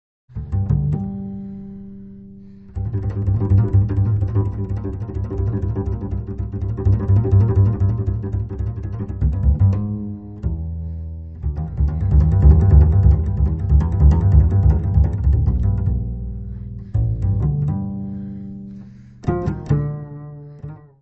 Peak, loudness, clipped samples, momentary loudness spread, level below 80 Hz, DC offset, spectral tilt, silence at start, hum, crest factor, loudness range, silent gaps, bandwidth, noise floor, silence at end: 0 dBFS; -19 LUFS; under 0.1%; 19 LU; -22 dBFS; 0.2%; -11.5 dB/octave; 0.35 s; none; 18 dB; 9 LU; none; 2.2 kHz; -40 dBFS; 0.25 s